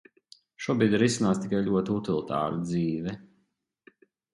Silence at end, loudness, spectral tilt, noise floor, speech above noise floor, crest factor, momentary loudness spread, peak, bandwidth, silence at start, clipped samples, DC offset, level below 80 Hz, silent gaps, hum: 1.1 s; -27 LUFS; -6 dB/octave; -74 dBFS; 48 dB; 18 dB; 11 LU; -10 dBFS; 11.5 kHz; 0.6 s; under 0.1%; under 0.1%; -60 dBFS; none; none